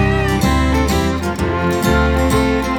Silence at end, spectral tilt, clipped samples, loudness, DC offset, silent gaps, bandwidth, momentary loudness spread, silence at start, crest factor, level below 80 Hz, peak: 0 s; -6 dB/octave; under 0.1%; -16 LUFS; under 0.1%; none; 19 kHz; 4 LU; 0 s; 12 dB; -22 dBFS; -2 dBFS